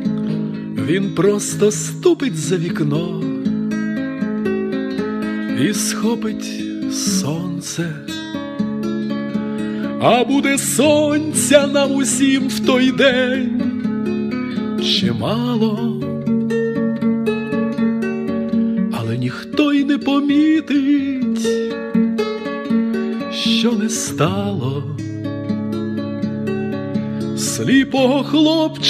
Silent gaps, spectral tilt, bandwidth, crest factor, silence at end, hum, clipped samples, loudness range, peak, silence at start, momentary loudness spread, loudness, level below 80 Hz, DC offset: none; -4.5 dB/octave; 15.5 kHz; 18 dB; 0 s; none; under 0.1%; 6 LU; 0 dBFS; 0 s; 9 LU; -18 LUFS; -56 dBFS; under 0.1%